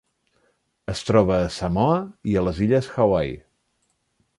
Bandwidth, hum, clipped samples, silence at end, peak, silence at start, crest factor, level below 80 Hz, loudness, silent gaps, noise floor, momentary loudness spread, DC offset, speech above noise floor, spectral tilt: 11.5 kHz; none; under 0.1%; 1 s; -4 dBFS; 0.9 s; 20 dB; -42 dBFS; -22 LUFS; none; -71 dBFS; 12 LU; under 0.1%; 50 dB; -7 dB/octave